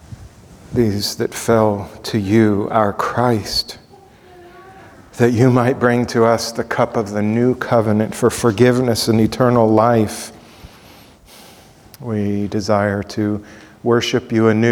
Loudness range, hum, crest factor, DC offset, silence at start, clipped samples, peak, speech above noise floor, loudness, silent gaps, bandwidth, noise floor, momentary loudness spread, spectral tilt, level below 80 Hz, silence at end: 6 LU; none; 16 dB; under 0.1%; 0.1 s; under 0.1%; 0 dBFS; 29 dB; -17 LUFS; none; 18.5 kHz; -45 dBFS; 9 LU; -6 dB/octave; -46 dBFS; 0 s